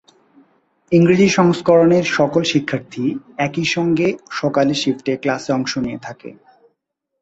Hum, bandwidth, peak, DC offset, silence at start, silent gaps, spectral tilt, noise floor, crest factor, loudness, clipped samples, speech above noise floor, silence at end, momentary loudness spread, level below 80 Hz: none; 8 kHz; -2 dBFS; under 0.1%; 0.9 s; none; -5.5 dB/octave; -74 dBFS; 16 dB; -17 LUFS; under 0.1%; 58 dB; 0.9 s; 11 LU; -56 dBFS